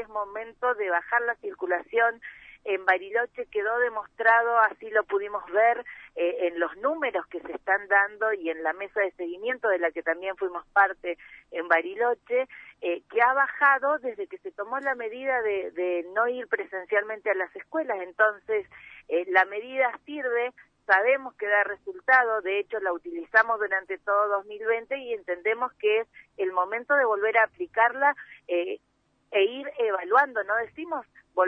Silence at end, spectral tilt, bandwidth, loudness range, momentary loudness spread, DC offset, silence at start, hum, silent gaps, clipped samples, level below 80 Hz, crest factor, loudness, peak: 0 s; -5 dB/octave; 6 kHz; 3 LU; 12 LU; under 0.1%; 0 s; none; none; under 0.1%; -70 dBFS; 20 dB; -26 LUFS; -8 dBFS